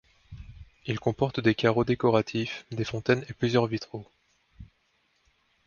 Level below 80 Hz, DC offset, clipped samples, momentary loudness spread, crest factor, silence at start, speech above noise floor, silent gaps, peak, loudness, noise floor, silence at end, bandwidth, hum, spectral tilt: -54 dBFS; under 0.1%; under 0.1%; 17 LU; 22 dB; 0.3 s; 44 dB; none; -8 dBFS; -27 LUFS; -70 dBFS; 1 s; 7.2 kHz; none; -6.5 dB/octave